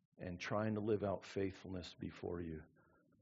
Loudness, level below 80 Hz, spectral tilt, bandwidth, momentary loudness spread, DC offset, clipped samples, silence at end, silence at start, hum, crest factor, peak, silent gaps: -43 LUFS; -72 dBFS; -6 dB/octave; 7.4 kHz; 11 LU; under 0.1%; under 0.1%; 0.55 s; 0.2 s; none; 18 dB; -26 dBFS; none